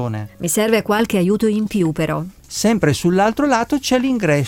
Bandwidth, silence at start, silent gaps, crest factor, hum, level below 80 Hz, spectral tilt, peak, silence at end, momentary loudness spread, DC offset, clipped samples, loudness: 17 kHz; 0 s; none; 16 dB; none; -46 dBFS; -5 dB/octave; -2 dBFS; 0 s; 6 LU; under 0.1%; under 0.1%; -17 LUFS